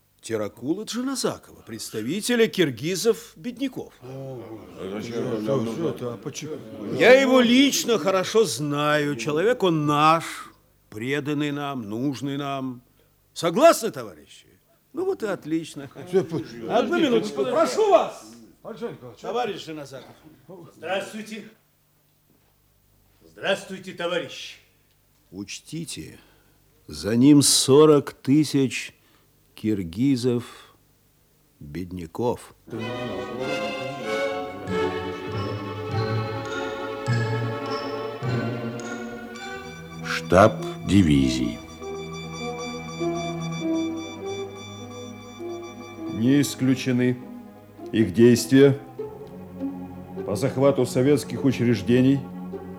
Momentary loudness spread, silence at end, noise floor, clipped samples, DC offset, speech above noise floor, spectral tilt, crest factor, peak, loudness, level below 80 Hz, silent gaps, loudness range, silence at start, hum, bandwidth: 20 LU; 0 s; -63 dBFS; under 0.1%; under 0.1%; 41 dB; -5 dB/octave; 22 dB; -2 dBFS; -23 LUFS; -54 dBFS; none; 13 LU; 0.25 s; none; 17 kHz